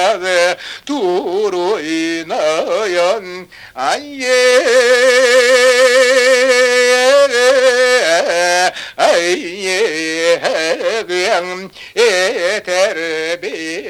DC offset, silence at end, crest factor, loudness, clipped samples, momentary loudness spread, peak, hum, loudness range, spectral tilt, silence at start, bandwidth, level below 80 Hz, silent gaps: under 0.1%; 0 s; 14 dB; -13 LUFS; under 0.1%; 10 LU; 0 dBFS; none; 7 LU; -1.5 dB/octave; 0 s; 15.5 kHz; -60 dBFS; none